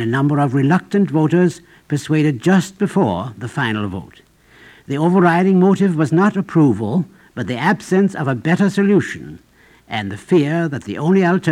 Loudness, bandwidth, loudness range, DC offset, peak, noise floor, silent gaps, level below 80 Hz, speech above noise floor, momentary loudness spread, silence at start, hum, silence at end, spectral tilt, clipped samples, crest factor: -17 LUFS; 12 kHz; 3 LU; under 0.1%; 0 dBFS; -47 dBFS; none; -56 dBFS; 31 dB; 12 LU; 0 s; none; 0 s; -7.5 dB/octave; under 0.1%; 16 dB